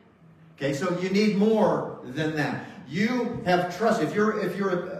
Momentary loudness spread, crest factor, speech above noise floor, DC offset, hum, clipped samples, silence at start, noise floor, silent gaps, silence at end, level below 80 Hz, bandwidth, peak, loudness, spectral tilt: 9 LU; 16 dB; 28 dB; under 0.1%; none; under 0.1%; 0.6 s; -53 dBFS; none; 0 s; -62 dBFS; 14.5 kHz; -8 dBFS; -25 LUFS; -6.5 dB/octave